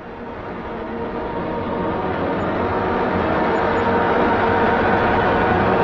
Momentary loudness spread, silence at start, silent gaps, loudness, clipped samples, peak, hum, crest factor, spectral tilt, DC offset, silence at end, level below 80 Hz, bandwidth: 11 LU; 0 s; none; -19 LUFS; under 0.1%; -6 dBFS; none; 14 dB; -8 dB/octave; under 0.1%; 0 s; -38 dBFS; 7.4 kHz